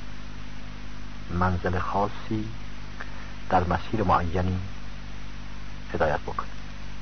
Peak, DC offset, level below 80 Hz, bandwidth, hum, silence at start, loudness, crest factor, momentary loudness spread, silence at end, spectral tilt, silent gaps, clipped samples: -10 dBFS; 3%; -40 dBFS; 6.6 kHz; 50 Hz at -40 dBFS; 0 s; -28 LUFS; 20 dB; 17 LU; 0 s; -7 dB/octave; none; under 0.1%